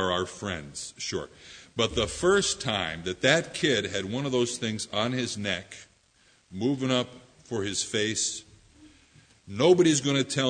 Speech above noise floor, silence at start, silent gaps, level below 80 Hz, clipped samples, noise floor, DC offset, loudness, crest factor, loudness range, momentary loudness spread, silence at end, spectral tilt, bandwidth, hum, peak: 36 dB; 0 s; none; -54 dBFS; under 0.1%; -63 dBFS; under 0.1%; -27 LUFS; 22 dB; 4 LU; 15 LU; 0 s; -3.5 dB/octave; 9.6 kHz; none; -6 dBFS